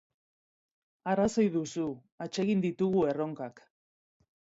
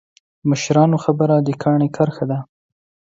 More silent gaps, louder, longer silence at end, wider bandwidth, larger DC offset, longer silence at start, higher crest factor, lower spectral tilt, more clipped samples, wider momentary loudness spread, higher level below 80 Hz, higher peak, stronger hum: first, 2.12-2.18 s vs none; second, -31 LUFS vs -18 LUFS; first, 1 s vs 0.65 s; about the same, 8 kHz vs 7.8 kHz; neither; first, 1.05 s vs 0.45 s; about the same, 16 dB vs 16 dB; about the same, -6.5 dB/octave vs -7 dB/octave; neither; first, 14 LU vs 9 LU; second, -66 dBFS vs -58 dBFS; second, -16 dBFS vs -2 dBFS; neither